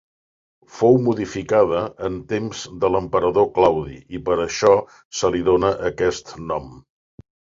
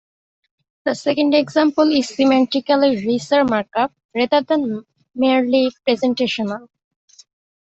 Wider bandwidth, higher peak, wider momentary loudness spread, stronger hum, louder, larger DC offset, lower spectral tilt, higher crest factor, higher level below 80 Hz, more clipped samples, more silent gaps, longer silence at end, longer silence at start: about the same, 7.8 kHz vs 8.2 kHz; about the same, -2 dBFS vs -2 dBFS; first, 12 LU vs 9 LU; neither; about the same, -20 LUFS vs -18 LUFS; neither; about the same, -5.5 dB/octave vs -5 dB/octave; about the same, 20 dB vs 16 dB; first, -46 dBFS vs -62 dBFS; neither; about the same, 5.05-5.11 s vs 4.05-4.09 s; second, 0.8 s vs 1.1 s; about the same, 0.75 s vs 0.85 s